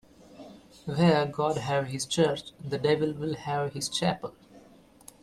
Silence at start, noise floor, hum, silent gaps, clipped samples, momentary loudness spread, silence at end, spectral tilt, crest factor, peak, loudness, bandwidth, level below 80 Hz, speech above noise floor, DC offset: 0.3 s; -55 dBFS; none; none; under 0.1%; 19 LU; 0.65 s; -5 dB/octave; 20 dB; -10 dBFS; -28 LUFS; 13.5 kHz; -62 dBFS; 28 dB; under 0.1%